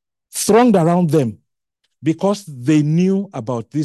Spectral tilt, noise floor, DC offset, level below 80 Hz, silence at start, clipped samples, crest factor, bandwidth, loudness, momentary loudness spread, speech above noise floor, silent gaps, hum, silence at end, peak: -6.5 dB/octave; -72 dBFS; under 0.1%; -58 dBFS; 0.35 s; under 0.1%; 14 dB; 12.5 kHz; -17 LUFS; 12 LU; 57 dB; none; none; 0 s; -2 dBFS